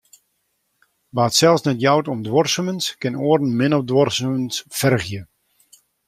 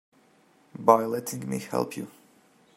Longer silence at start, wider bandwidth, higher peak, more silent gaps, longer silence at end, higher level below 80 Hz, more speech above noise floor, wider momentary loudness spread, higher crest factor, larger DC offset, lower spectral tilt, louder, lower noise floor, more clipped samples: first, 1.15 s vs 0.8 s; about the same, 16 kHz vs 16 kHz; about the same, -2 dBFS vs -2 dBFS; neither; first, 0.85 s vs 0.65 s; first, -58 dBFS vs -72 dBFS; first, 52 dB vs 35 dB; second, 8 LU vs 19 LU; second, 20 dB vs 26 dB; neither; about the same, -4.5 dB/octave vs -5.5 dB/octave; first, -19 LUFS vs -26 LUFS; first, -70 dBFS vs -61 dBFS; neither